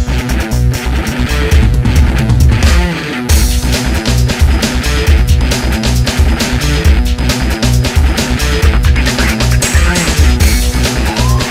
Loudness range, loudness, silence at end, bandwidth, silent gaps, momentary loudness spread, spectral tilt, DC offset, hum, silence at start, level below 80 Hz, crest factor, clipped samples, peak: 1 LU; -11 LUFS; 0 s; 16.5 kHz; none; 3 LU; -4.5 dB/octave; under 0.1%; none; 0 s; -12 dBFS; 10 dB; 0.3%; 0 dBFS